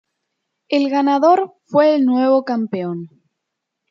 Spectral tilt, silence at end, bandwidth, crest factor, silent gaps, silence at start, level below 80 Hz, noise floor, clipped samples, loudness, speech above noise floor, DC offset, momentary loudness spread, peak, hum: -7 dB/octave; 0.85 s; 7.2 kHz; 16 dB; none; 0.7 s; -74 dBFS; -79 dBFS; under 0.1%; -16 LUFS; 63 dB; under 0.1%; 10 LU; -2 dBFS; none